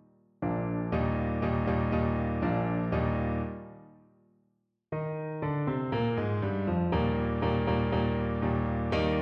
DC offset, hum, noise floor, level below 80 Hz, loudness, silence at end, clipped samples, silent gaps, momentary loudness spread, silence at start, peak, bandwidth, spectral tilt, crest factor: under 0.1%; none; -75 dBFS; -40 dBFS; -30 LUFS; 0 s; under 0.1%; none; 7 LU; 0.4 s; -16 dBFS; 6.4 kHz; -9.5 dB/octave; 14 dB